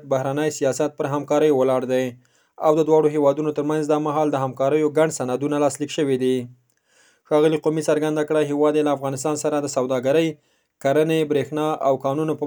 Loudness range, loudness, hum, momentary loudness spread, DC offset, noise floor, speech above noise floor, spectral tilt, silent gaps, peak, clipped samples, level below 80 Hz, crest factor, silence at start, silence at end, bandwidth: 2 LU; -21 LUFS; none; 6 LU; under 0.1%; -59 dBFS; 39 dB; -5.5 dB/octave; none; -4 dBFS; under 0.1%; -72 dBFS; 16 dB; 0.05 s; 0 s; over 20 kHz